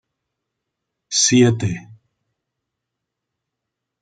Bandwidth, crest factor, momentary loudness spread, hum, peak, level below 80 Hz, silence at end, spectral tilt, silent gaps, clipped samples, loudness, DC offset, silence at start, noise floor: 9.4 kHz; 20 dB; 13 LU; none; -2 dBFS; -62 dBFS; 2.1 s; -4 dB/octave; none; under 0.1%; -16 LUFS; under 0.1%; 1.1 s; -81 dBFS